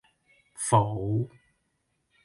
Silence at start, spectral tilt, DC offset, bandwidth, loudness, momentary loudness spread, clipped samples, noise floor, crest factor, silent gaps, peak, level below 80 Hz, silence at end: 0.6 s; -6 dB/octave; under 0.1%; 11.5 kHz; -27 LUFS; 10 LU; under 0.1%; -76 dBFS; 24 dB; none; -6 dBFS; -56 dBFS; 0.95 s